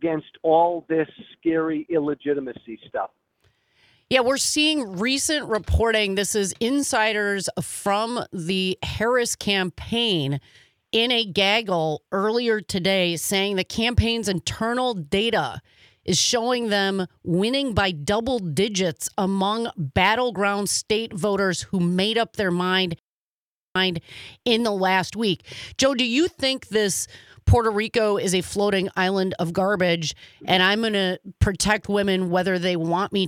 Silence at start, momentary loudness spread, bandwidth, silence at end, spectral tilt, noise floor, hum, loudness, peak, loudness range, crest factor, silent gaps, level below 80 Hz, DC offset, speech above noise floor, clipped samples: 0 s; 8 LU; 16.5 kHz; 0 s; -4 dB/octave; under -90 dBFS; none; -22 LUFS; -4 dBFS; 2 LU; 20 dB; 23.01-23.73 s; -42 dBFS; under 0.1%; over 67 dB; under 0.1%